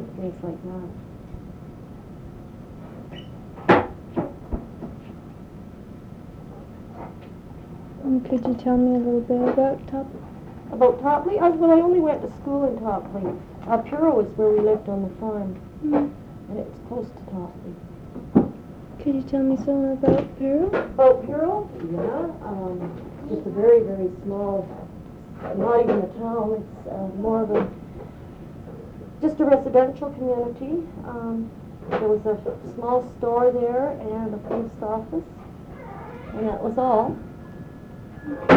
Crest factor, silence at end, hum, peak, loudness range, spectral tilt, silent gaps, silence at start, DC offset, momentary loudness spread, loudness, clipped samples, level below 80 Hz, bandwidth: 20 dB; 0 s; none; -4 dBFS; 8 LU; -9 dB/octave; none; 0 s; under 0.1%; 21 LU; -23 LUFS; under 0.1%; -48 dBFS; 7 kHz